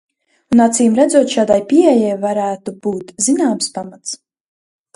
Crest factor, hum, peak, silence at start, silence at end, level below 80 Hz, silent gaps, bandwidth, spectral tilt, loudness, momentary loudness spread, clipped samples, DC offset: 14 dB; none; 0 dBFS; 0.5 s; 0.8 s; -58 dBFS; none; 11.5 kHz; -4 dB/octave; -14 LUFS; 15 LU; under 0.1%; under 0.1%